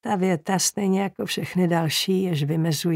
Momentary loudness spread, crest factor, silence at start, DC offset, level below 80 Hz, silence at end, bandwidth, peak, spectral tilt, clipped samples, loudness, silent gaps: 4 LU; 16 dB; 0.05 s; under 0.1%; -66 dBFS; 0 s; 16 kHz; -8 dBFS; -4.5 dB/octave; under 0.1%; -23 LUFS; none